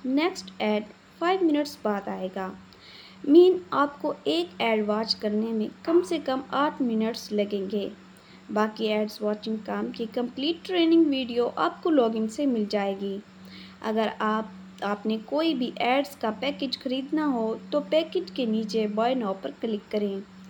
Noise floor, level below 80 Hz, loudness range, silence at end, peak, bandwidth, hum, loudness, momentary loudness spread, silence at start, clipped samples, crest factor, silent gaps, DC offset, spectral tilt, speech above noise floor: -48 dBFS; -70 dBFS; 5 LU; 0 s; -6 dBFS; 20 kHz; none; -26 LUFS; 9 LU; 0.05 s; under 0.1%; 20 dB; none; under 0.1%; -5.5 dB/octave; 23 dB